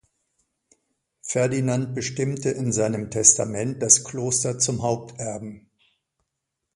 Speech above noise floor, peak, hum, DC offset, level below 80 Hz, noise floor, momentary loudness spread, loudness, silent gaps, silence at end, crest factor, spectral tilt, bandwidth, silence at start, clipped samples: 58 dB; 0 dBFS; none; under 0.1%; -58 dBFS; -81 dBFS; 16 LU; -22 LUFS; none; 1.15 s; 26 dB; -3.5 dB/octave; 11.5 kHz; 1.25 s; under 0.1%